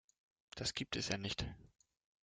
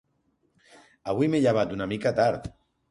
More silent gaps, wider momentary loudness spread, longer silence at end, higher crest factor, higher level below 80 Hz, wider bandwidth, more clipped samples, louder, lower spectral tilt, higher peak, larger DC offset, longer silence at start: neither; about the same, 14 LU vs 15 LU; first, 0.55 s vs 0.4 s; first, 24 dB vs 18 dB; second, -60 dBFS vs -54 dBFS; second, 10 kHz vs 11.5 kHz; neither; second, -41 LUFS vs -25 LUFS; second, -3.5 dB/octave vs -7 dB/octave; second, -22 dBFS vs -10 dBFS; neither; second, 0.55 s vs 1.05 s